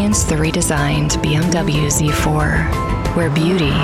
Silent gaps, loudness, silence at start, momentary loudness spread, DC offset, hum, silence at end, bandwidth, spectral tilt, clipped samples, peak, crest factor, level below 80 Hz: none; -16 LUFS; 0 s; 2 LU; 0.1%; none; 0 s; 16 kHz; -4.5 dB/octave; under 0.1%; -2 dBFS; 12 dB; -26 dBFS